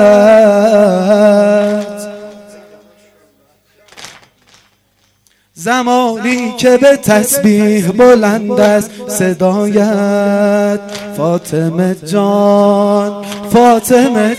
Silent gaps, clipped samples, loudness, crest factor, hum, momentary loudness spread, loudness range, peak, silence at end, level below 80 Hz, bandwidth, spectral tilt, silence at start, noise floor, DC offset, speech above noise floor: none; under 0.1%; -10 LUFS; 10 dB; 50 Hz at -40 dBFS; 10 LU; 9 LU; 0 dBFS; 0 s; -50 dBFS; 15.5 kHz; -5.5 dB/octave; 0 s; -56 dBFS; under 0.1%; 46 dB